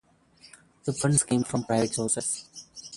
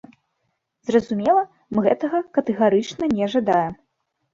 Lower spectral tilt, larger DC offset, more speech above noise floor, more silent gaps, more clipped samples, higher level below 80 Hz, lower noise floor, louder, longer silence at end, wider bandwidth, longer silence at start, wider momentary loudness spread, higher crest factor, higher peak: second, -4.5 dB/octave vs -6.5 dB/octave; neither; second, 30 dB vs 54 dB; neither; neither; about the same, -60 dBFS vs -58 dBFS; second, -57 dBFS vs -74 dBFS; second, -26 LUFS vs -21 LUFS; second, 0 s vs 0.6 s; first, 11.5 kHz vs 7.6 kHz; about the same, 0.85 s vs 0.85 s; first, 13 LU vs 5 LU; about the same, 20 dB vs 18 dB; second, -8 dBFS vs -4 dBFS